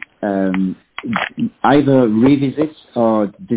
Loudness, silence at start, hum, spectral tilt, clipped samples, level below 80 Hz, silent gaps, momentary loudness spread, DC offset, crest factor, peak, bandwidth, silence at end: -16 LUFS; 0.2 s; none; -11.5 dB/octave; under 0.1%; -50 dBFS; none; 10 LU; under 0.1%; 14 dB; -2 dBFS; 4 kHz; 0 s